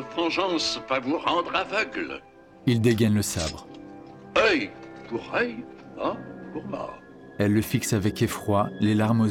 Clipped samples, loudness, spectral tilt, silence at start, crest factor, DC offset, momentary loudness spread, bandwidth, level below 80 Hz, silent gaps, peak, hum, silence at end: under 0.1%; -25 LUFS; -5 dB/octave; 0 s; 18 dB; under 0.1%; 18 LU; 17 kHz; -54 dBFS; none; -8 dBFS; none; 0 s